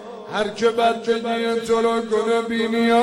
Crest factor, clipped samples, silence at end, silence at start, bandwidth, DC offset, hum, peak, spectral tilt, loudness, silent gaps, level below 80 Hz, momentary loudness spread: 14 dB; under 0.1%; 0 s; 0 s; 13 kHz; under 0.1%; none; -6 dBFS; -4.5 dB/octave; -21 LUFS; none; -58 dBFS; 5 LU